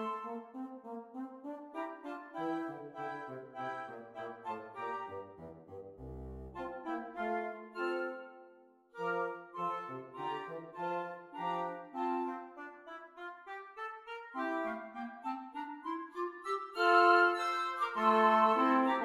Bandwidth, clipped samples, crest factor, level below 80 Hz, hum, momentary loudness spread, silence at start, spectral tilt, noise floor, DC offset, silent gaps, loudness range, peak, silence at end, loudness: 13.5 kHz; under 0.1%; 22 dB; -66 dBFS; none; 20 LU; 0 s; -5.5 dB/octave; -62 dBFS; under 0.1%; none; 12 LU; -16 dBFS; 0 s; -36 LUFS